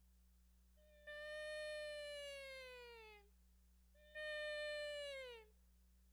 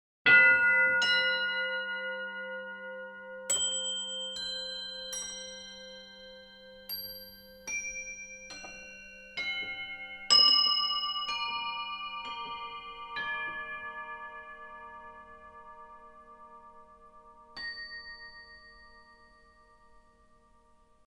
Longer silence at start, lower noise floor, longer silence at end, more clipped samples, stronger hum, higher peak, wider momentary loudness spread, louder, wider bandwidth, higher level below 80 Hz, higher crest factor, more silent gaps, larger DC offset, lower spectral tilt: second, 0 s vs 0.25 s; first, -71 dBFS vs -63 dBFS; second, 0 s vs 2.05 s; neither; first, 60 Hz at -70 dBFS vs none; second, -40 dBFS vs -10 dBFS; second, 15 LU vs 26 LU; second, -50 LUFS vs -28 LUFS; about the same, over 20 kHz vs over 20 kHz; second, -72 dBFS vs -66 dBFS; second, 14 dB vs 24 dB; neither; neither; first, -1.5 dB/octave vs 1 dB/octave